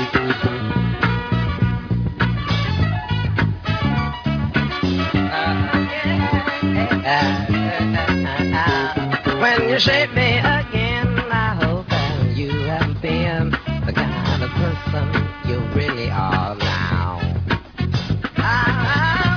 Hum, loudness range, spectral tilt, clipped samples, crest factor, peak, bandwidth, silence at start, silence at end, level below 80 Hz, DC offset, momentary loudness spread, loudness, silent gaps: none; 4 LU; -7 dB/octave; under 0.1%; 18 dB; -2 dBFS; 5.4 kHz; 0 s; 0 s; -34 dBFS; under 0.1%; 6 LU; -19 LUFS; none